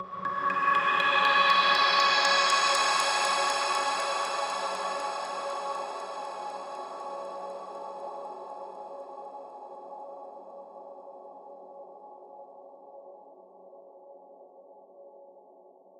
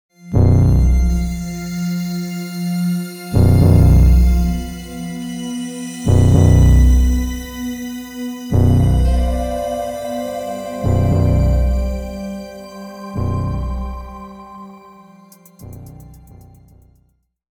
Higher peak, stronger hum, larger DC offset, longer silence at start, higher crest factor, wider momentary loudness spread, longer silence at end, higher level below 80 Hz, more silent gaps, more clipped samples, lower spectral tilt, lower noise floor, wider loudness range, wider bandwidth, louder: second, -10 dBFS vs 0 dBFS; neither; neither; second, 0 s vs 0.25 s; about the same, 20 dB vs 16 dB; first, 26 LU vs 19 LU; second, 0.6 s vs 1.35 s; second, -78 dBFS vs -20 dBFS; neither; neither; second, 0 dB/octave vs -7.5 dB/octave; second, -55 dBFS vs -61 dBFS; first, 25 LU vs 12 LU; second, 15.5 kHz vs 18.5 kHz; second, -26 LUFS vs -17 LUFS